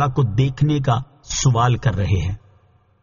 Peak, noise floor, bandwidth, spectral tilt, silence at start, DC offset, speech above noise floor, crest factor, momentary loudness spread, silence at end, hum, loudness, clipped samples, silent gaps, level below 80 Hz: -4 dBFS; -55 dBFS; 7.4 kHz; -6.5 dB/octave; 0 s; under 0.1%; 38 dB; 16 dB; 9 LU; 0.65 s; none; -19 LUFS; under 0.1%; none; -38 dBFS